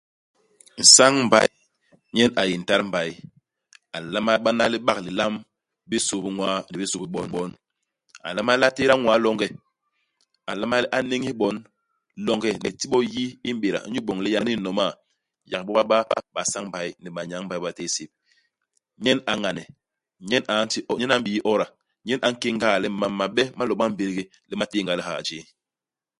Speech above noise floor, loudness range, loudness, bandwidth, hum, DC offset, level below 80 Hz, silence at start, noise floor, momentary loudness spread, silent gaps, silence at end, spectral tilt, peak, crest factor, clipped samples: over 67 dB; 5 LU; -22 LUFS; 11.5 kHz; none; under 0.1%; -62 dBFS; 0.75 s; under -90 dBFS; 13 LU; none; 0.8 s; -2.5 dB/octave; 0 dBFS; 24 dB; under 0.1%